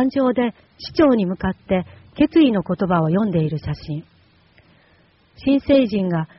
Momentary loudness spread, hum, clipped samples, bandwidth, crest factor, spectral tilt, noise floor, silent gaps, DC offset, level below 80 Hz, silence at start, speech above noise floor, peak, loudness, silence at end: 12 LU; none; under 0.1%; 6 kHz; 16 dB; -6.5 dB/octave; -56 dBFS; none; under 0.1%; -46 dBFS; 0 s; 37 dB; -4 dBFS; -19 LUFS; 0.15 s